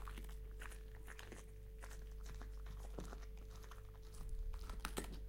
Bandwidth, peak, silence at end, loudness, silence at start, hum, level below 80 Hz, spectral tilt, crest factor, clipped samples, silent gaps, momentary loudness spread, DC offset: 16.5 kHz; -26 dBFS; 0 s; -54 LUFS; 0 s; none; -50 dBFS; -4.5 dB/octave; 24 dB; under 0.1%; none; 8 LU; under 0.1%